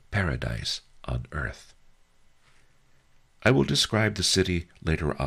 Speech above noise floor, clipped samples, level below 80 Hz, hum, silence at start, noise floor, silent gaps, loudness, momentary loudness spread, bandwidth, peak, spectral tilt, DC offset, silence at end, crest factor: 33 dB; under 0.1%; -42 dBFS; none; 0.1 s; -59 dBFS; none; -26 LUFS; 12 LU; 15.5 kHz; -10 dBFS; -4 dB/octave; under 0.1%; 0 s; 20 dB